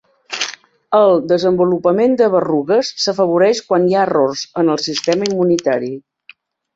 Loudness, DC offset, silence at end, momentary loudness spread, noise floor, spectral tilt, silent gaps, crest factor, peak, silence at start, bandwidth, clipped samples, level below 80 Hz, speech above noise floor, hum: -15 LUFS; under 0.1%; 0.75 s; 9 LU; -47 dBFS; -5 dB/octave; none; 14 dB; -2 dBFS; 0.3 s; 8 kHz; under 0.1%; -60 dBFS; 33 dB; none